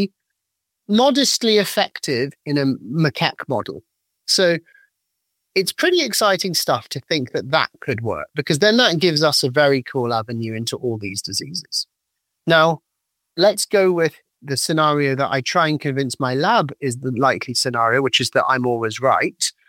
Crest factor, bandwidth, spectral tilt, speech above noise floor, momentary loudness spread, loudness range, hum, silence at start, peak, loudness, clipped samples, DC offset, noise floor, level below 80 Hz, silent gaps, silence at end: 18 dB; 17 kHz; -4 dB/octave; 60 dB; 10 LU; 3 LU; none; 0 s; 0 dBFS; -19 LUFS; under 0.1%; under 0.1%; -79 dBFS; -64 dBFS; none; 0.2 s